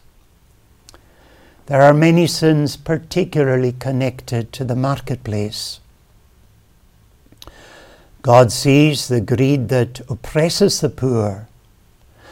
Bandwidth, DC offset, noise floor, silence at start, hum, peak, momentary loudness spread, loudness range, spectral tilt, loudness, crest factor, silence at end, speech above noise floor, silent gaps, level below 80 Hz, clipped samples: 17 kHz; under 0.1%; -52 dBFS; 1.7 s; none; 0 dBFS; 12 LU; 10 LU; -6 dB/octave; -16 LUFS; 18 dB; 0.85 s; 36 dB; none; -46 dBFS; under 0.1%